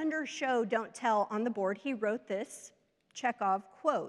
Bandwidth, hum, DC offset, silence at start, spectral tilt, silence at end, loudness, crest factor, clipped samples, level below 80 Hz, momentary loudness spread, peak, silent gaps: 12.5 kHz; none; under 0.1%; 0 s; -4.5 dB/octave; 0 s; -33 LUFS; 18 dB; under 0.1%; -88 dBFS; 8 LU; -16 dBFS; none